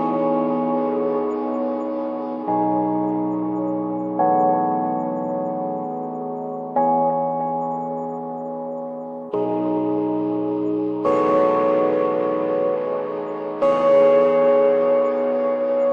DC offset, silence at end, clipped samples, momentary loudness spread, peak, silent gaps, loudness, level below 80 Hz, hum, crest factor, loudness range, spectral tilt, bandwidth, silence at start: under 0.1%; 0 s; under 0.1%; 12 LU; -6 dBFS; none; -21 LUFS; -68 dBFS; none; 14 dB; 6 LU; -9 dB/octave; 5.2 kHz; 0 s